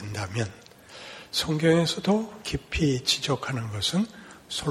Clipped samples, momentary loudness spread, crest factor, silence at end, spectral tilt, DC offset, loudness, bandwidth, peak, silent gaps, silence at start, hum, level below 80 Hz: under 0.1%; 18 LU; 18 dB; 0 s; -4.5 dB/octave; under 0.1%; -26 LUFS; 14.5 kHz; -8 dBFS; none; 0 s; none; -48 dBFS